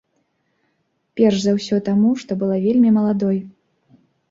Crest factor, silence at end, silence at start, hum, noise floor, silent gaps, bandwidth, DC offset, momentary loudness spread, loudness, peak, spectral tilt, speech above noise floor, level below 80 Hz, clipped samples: 16 dB; 0.8 s; 1.15 s; none; -69 dBFS; none; 7.8 kHz; under 0.1%; 7 LU; -18 LUFS; -4 dBFS; -7 dB/octave; 52 dB; -60 dBFS; under 0.1%